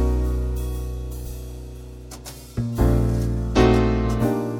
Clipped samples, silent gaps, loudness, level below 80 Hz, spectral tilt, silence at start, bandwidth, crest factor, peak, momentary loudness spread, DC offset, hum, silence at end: under 0.1%; none; -22 LUFS; -26 dBFS; -7 dB/octave; 0 s; 16.5 kHz; 18 dB; -2 dBFS; 20 LU; under 0.1%; none; 0 s